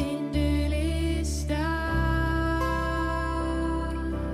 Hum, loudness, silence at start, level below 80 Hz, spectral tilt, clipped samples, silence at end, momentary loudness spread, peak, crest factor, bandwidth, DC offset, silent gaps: none; -28 LUFS; 0 s; -30 dBFS; -6 dB/octave; under 0.1%; 0 s; 3 LU; -14 dBFS; 12 dB; 14.5 kHz; under 0.1%; none